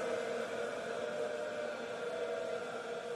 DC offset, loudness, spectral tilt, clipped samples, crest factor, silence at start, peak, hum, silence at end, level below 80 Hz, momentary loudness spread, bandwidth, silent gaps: under 0.1%; -40 LUFS; -3.5 dB/octave; under 0.1%; 14 dB; 0 s; -26 dBFS; none; 0 s; -80 dBFS; 3 LU; 13.5 kHz; none